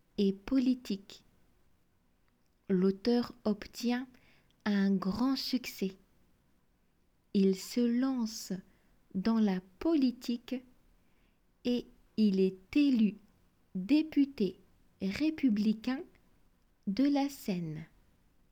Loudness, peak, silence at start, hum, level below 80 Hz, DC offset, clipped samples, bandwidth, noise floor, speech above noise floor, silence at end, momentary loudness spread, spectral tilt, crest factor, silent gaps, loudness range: -32 LUFS; -18 dBFS; 0.2 s; none; -64 dBFS; under 0.1%; under 0.1%; 19.5 kHz; -71 dBFS; 40 dB; 0.65 s; 11 LU; -6.5 dB/octave; 16 dB; none; 4 LU